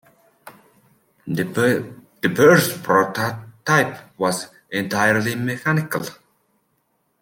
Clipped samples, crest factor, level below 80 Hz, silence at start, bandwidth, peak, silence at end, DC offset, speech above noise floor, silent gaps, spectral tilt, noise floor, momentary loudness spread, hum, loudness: under 0.1%; 20 dB; -62 dBFS; 0.45 s; 17 kHz; -2 dBFS; 1.05 s; under 0.1%; 49 dB; none; -5 dB/octave; -68 dBFS; 14 LU; none; -20 LUFS